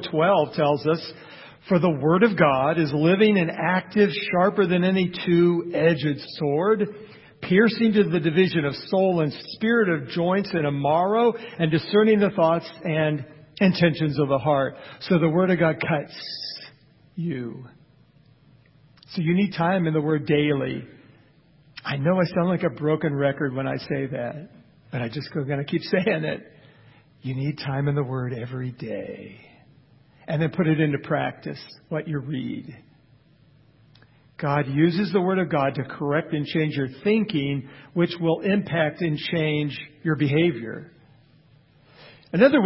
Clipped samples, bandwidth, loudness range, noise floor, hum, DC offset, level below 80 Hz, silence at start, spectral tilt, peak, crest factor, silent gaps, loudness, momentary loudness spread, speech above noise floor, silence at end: under 0.1%; 5.8 kHz; 8 LU; -56 dBFS; none; under 0.1%; -60 dBFS; 0 s; -11 dB/octave; -4 dBFS; 20 dB; none; -23 LUFS; 13 LU; 34 dB; 0 s